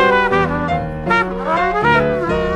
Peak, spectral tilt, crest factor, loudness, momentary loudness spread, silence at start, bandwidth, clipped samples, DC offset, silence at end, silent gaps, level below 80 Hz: -2 dBFS; -6.5 dB/octave; 14 dB; -16 LUFS; 5 LU; 0 s; 11.5 kHz; under 0.1%; under 0.1%; 0 s; none; -34 dBFS